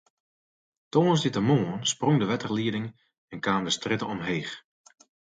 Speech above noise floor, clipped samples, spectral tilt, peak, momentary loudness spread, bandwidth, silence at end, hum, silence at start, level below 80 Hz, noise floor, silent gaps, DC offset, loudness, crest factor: over 64 dB; under 0.1%; -5 dB/octave; -10 dBFS; 12 LU; 9.4 kHz; 0.8 s; none; 0.95 s; -64 dBFS; under -90 dBFS; 3.18-3.28 s; under 0.1%; -26 LUFS; 18 dB